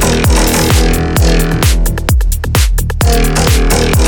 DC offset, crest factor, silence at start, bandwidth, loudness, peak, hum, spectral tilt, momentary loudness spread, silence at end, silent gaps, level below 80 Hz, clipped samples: under 0.1%; 10 dB; 0 s; 19 kHz; -11 LUFS; 0 dBFS; none; -4.5 dB/octave; 4 LU; 0 s; none; -12 dBFS; under 0.1%